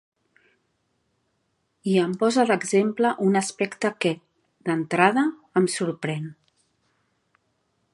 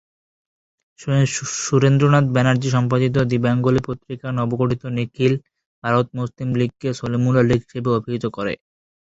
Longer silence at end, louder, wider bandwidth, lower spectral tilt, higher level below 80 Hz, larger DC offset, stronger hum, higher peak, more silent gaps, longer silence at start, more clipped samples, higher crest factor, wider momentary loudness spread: first, 1.6 s vs 0.6 s; second, -23 LUFS vs -20 LUFS; first, 11.5 kHz vs 8 kHz; second, -5 dB/octave vs -6.5 dB/octave; second, -76 dBFS vs -50 dBFS; neither; neither; about the same, -2 dBFS vs -2 dBFS; second, none vs 5.66-5.82 s; first, 1.85 s vs 1 s; neither; first, 24 dB vs 18 dB; about the same, 11 LU vs 11 LU